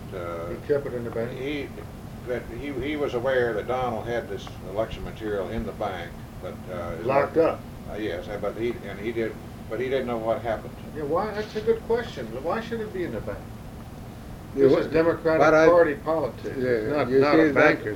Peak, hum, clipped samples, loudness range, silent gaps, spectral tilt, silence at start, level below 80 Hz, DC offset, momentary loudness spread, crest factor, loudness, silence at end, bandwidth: -4 dBFS; none; under 0.1%; 8 LU; none; -6.5 dB/octave; 0 s; -46 dBFS; under 0.1%; 18 LU; 22 dB; -25 LUFS; 0 s; 16.5 kHz